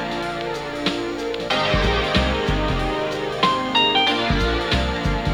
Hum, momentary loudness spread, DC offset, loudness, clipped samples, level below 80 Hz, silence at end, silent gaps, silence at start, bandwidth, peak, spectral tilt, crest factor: none; 8 LU; under 0.1%; -21 LUFS; under 0.1%; -30 dBFS; 0 s; none; 0 s; 19.5 kHz; -4 dBFS; -5 dB/octave; 18 dB